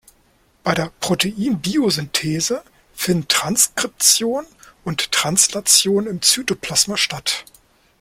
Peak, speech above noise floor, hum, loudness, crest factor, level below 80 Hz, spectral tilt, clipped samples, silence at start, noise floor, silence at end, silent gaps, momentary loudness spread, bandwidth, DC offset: 0 dBFS; 39 dB; none; -17 LUFS; 20 dB; -52 dBFS; -2 dB/octave; under 0.1%; 0.65 s; -58 dBFS; 0.6 s; none; 11 LU; 16.5 kHz; under 0.1%